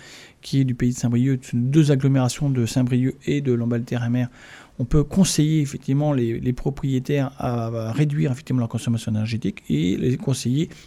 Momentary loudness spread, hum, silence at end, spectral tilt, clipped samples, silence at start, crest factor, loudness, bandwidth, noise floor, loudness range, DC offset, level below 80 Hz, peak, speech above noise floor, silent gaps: 7 LU; none; 0.05 s; -6.5 dB/octave; under 0.1%; 0 s; 18 dB; -22 LUFS; 13.5 kHz; -42 dBFS; 3 LU; under 0.1%; -40 dBFS; -4 dBFS; 21 dB; none